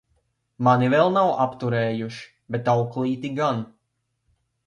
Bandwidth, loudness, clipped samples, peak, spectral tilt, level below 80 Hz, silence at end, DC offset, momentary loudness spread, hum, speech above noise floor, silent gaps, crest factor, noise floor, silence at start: 9.8 kHz; -22 LUFS; under 0.1%; -6 dBFS; -7.5 dB/octave; -64 dBFS; 1 s; under 0.1%; 13 LU; none; 54 dB; none; 18 dB; -75 dBFS; 0.6 s